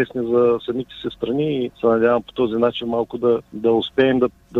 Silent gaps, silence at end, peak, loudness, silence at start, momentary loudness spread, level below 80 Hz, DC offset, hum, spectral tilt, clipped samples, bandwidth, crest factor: none; 0 s; -4 dBFS; -20 LUFS; 0 s; 7 LU; -52 dBFS; under 0.1%; none; -8 dB/octave; under 0.1%; 4.5 kHz; 14 dB